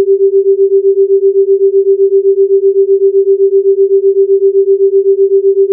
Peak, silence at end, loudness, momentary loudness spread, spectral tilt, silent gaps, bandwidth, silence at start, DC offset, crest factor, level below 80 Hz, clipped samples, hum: -2 dBFS; 0 s; -9 LUFS; 0 LU; -14.5 dB/octave; none; 0.5 kHz; 0 s; under 0.1%; 6 dB; -88 dBFS; under 0.1%; none